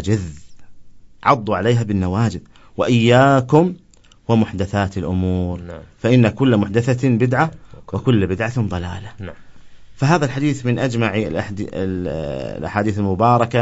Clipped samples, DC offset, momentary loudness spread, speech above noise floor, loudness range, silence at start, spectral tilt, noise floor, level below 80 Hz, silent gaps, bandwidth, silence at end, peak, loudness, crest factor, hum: under 0.1%; under 0.1%; 15 LU; 21 dB; 4 LU; 0 s; -7 dB/octave; -39 dBFS; -44 dBFS; none; 8 kHz; 0 s; 0 dBFS; -18 LUFS; 18 dB; none